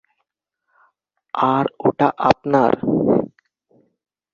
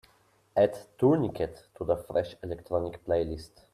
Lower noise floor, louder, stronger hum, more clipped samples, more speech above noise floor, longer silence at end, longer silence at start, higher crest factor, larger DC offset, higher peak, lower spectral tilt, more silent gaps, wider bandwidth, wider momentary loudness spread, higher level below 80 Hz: first, -76 dBFS vs -65 dBFS; first, -18 LUFS vs -30 LUFS; first, 50 Hz at -55 dBFS vs none; neither; first, 59 dB vs 36 dB; first, 1.05 s vs 0.25 s; first, 1.35 s vs 0.55 s; about the same, 20 dB vs 20 dB; neither; first, -2 dBFS vs -10 dBFS; about the same, -8 dB/octave vs -8 dB/octave; neither; second, 7 kHz vs 14 kHz; second, 5 LU vs 12 LU; about the same, -54 dBFS vs -54 dBFS